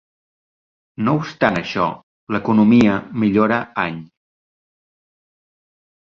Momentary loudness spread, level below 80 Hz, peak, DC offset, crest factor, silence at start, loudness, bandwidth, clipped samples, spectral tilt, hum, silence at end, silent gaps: 11 LU; -52 dBFS; -2 dBFS; under 0.1%; 18 dB; 1 s; -18 LUFS; 7.2 kHz; under 0.1%; -7.5 dB/octave; none; 2 s; 2.03-2.27 s